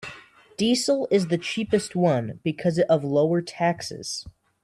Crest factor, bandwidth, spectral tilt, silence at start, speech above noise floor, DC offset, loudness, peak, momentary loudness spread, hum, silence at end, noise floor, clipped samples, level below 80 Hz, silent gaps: 16 dB; 13 kHz; -5.5 dB/octave; 0 s; 24 dB; under 0.1%; -24 LUFS; -8 dBFS; 11 LU; none; 0.35 s; -47 dBFS; under 0.1%; -60 dBFS; none